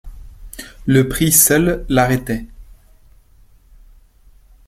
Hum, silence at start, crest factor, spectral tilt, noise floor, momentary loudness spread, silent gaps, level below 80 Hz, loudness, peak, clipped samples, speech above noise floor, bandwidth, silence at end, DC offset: none; 0.05 s; 20 dB; -4 dB/octave; -48 dBFS; 24 LU; none; -36 dBFS; -15 LUFS; 0 dBFS; under 0.1%; 34 dB; 16.5 kHz; 2.05 s; under 0.1%